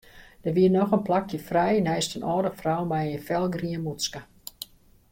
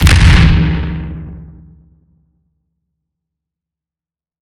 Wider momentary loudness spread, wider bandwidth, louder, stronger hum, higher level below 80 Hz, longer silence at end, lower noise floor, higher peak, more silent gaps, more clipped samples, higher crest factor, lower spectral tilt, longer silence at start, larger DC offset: second, 18 LU vs 23 LU; about the same, 16.5 kHz vs 15 kHz; second, -26 LUFS vs -11 LUFS; neither; second, -56 dBFS vs -18 dBFS; second, 0.45 s vs 2.95 s; second, -45 dBFS vs under -90 dBFS; second, -10 dBFS vs 0 dBFS; neither; neither; about the same, 16 dB vs 14 dB; about the same, -5.5 dB/octave vs -5.5 dB/octave; first, 0.15 s vs 0 s; neither